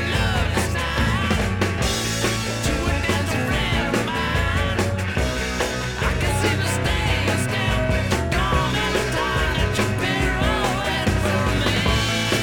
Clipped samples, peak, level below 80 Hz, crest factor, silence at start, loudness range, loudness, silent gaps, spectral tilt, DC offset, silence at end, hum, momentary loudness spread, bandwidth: under 0.1%; -6 dBFS; -30 dBFS; 14 dB; 0 s; 1 LU; -21 LUFS; none; -4.5 dB/octave; under 0.1%; 0 s; none; 3 LU; 19.5 kHz